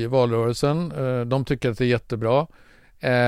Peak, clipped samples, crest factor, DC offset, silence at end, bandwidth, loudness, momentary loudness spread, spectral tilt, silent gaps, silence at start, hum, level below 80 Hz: -6 dBFS; under 0.1%; 16 dB; 0.2%; 0 s; 14 kHz; -23 LUFS; 4 LU; -7 dB/octave; none; 0 s; none; -48 dBFS